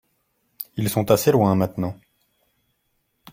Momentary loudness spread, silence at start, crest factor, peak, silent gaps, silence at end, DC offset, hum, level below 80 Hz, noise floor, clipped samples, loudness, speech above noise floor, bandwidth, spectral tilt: 17 LU; 0.6 s; 22 dB; -2 dBFS; none; 1.4 s; under 0.1%; none; -56 dBFS; -71 dBFS; under 0.1%; -21 LUFS; 52 dB; 16.5 kHz; -6 dB/octave